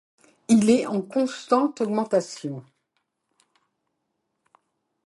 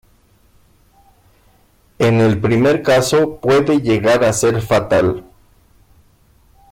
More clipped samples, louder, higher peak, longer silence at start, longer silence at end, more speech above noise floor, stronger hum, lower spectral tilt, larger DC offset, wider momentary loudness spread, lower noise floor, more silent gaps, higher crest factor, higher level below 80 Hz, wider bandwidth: neither; second, -23 LUFS vs -14 LUFS; about the same, -6 dBFS vs -4 dBFS; second, 0.5 s vs 2 s; first, 2.45 s vs 1.5 s; first, 55 dB vs 40 dB; neither; about the same, -5.5 dB/octave vs -5.5 dB/octave; neither; first, 16 LU vs 4 LU; first, -77 dBFS vs -53 dBFS; neither; first, 20 dB vs 12 dB; second, -68 dBFS vs -46 dBFS; second, 11.5 kHz vs 16.5 kHz